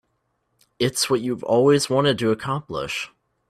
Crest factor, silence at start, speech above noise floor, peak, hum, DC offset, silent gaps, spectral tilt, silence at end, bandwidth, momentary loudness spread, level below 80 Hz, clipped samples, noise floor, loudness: 16 dB; 0.8 s; 51 dB; -6 dBFS; none; under 0.1%; none; -4.5 dB/octave; 0.45 s; 15 kHz; 10 LU; -58 dBFS; under 0.1%; -72 dBFS; -21 LUFS